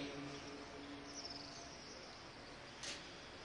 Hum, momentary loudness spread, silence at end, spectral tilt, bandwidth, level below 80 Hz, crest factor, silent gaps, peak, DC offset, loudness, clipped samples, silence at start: none; 6 LU; 0 s; -3 dB/octave; 11.5 kHz; -68 dBFS; 18 dB; none; -34 dBFS; under 0.1%; -50 LUFS; under 0.1%; 0 s